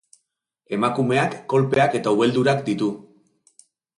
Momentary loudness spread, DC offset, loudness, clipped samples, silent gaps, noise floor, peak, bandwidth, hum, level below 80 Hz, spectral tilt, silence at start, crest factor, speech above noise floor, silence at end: 7 LU; under 0.1%; -21 LUFS; under 0.1%; none; -73 dBFS; -6 dBFS; 11.5 kHz; none; -62 dBFS; -6.5 dB/octave; 0.7 s; 16 dB; 53 dB; 0.95 s